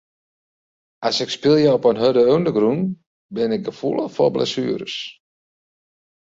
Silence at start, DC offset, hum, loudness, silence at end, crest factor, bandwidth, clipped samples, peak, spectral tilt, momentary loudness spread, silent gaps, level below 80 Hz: 1 s; under 0.1%; none; -19 LUFS; 1.1 s; 16 dB; 7.8 kHz; under 0.1%; -4 dBFS; -6 dB/octave; 13 LU; 3.06-3.29 s; -60 dBFS